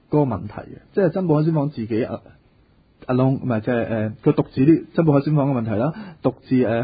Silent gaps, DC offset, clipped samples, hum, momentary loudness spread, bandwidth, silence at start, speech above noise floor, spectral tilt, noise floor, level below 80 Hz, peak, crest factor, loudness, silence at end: none; under 0.1%; under 0.1%; none; 10 LU; 5 kHz; 0.1 s; 36 dB; -13.5 dB/octave; -56 dBFS; -52 dBFS; -4 dBFS; 16 dB; -21 LUFS; 0 s